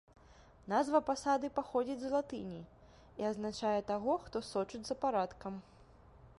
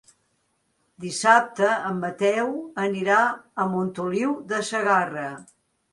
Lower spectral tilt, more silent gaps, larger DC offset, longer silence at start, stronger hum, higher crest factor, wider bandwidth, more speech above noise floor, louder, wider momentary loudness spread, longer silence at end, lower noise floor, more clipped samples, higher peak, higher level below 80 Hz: about the same, -5 dB/octave vs -4.5 dB/octave; neither; neither; second, 0.3 s vs 1 s; neither; about the same, 20 dB vs 22 dB; about the same, 11.5 kHz vs 11.5 kHz; second, 25 dB vs 47 dB; second, -36 LUFS vs -23 LUFS; first, 15 LU vs 12 LU; second, 0.1 s vs 0.5 s; second, -61 dBFS vs -71 dBFS; neither; second, -18 dBFS vs -4 dBFS; first, -64 dBFS vs -70 dBFS